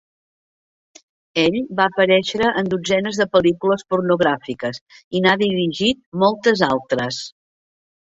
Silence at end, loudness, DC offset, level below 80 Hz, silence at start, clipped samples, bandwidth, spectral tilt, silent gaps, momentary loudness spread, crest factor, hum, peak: 0.85 s; -19 LUFS; under 0.1%; -56 dBFS; 1.35 s; under 0.1%; 8 kHz; -5 dB/octave; 4.81-4.87 s, 5.04-5.11 s, 6.06-6.12 s; 10 LU; 18 dB; none; -2 dBFS